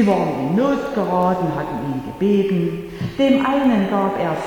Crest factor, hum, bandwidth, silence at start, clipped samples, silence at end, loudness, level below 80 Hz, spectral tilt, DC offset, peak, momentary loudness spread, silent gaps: 14 dB; none; 18.5 kHz; 0 s; under 0.1%; 0 s; -19 LUFS; -48 dBFS; -7.5 dB/octave; under 0.1%; -4 dBFS; 8 LU; none